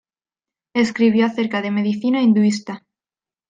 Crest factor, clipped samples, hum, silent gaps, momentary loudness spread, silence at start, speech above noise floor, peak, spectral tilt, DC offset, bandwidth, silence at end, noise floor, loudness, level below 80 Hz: 16 dB; under 0.1%; none; none; 11 LU; 0.75 s; over 73 dB; -4 dBFS; -6 dB/octave; under 0.1%; 9.2 kHz; 0.7 s; under -90 dBFS; -18 LUFS; -66 dBFS